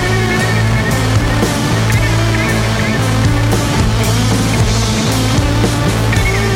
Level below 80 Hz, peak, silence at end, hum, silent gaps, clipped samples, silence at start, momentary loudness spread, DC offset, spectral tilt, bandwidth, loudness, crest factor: -22 dBFS; -4 dBFS; 0 s; none; none; under 0.1%; 0 s; 1 LU; under 0.1%; -5 dB/octave; 16.5 kHz; -13 LUFS; 8 dB